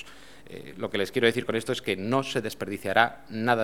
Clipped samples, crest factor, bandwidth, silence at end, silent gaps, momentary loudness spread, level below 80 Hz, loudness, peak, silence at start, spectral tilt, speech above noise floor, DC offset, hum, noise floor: under 0.1%; 24 dB; 17.5 kHz; 0 s; none; 18 LU; -62 dBFS; -27 LUFS; -4 dBFS; 0 s; -4.5 dB/octave; 22 dB; 0.4%; none; -49 dBFS